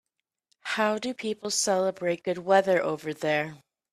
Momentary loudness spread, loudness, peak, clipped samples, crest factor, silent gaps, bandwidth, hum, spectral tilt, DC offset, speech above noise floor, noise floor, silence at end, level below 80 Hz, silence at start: 10 LU; -27 LUFS; -8 dBFS; under 0.1%; 20 dB; none; 14.5 kHz; none; -3 dB/octave; under 0.1%; 48 dB; -74 dBFS; 0.35 s; -74 dBFS; 0.65 s